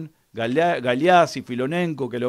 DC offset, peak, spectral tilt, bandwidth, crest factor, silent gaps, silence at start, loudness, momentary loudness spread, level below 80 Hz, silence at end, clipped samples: under 0.1%; -4 dBFS; -6 dB/octave; 13.5 kHz; 16 dB; none; 0 s; -21 LUFS; 11 LU; -64 dBFS; 0 s; under 0.1%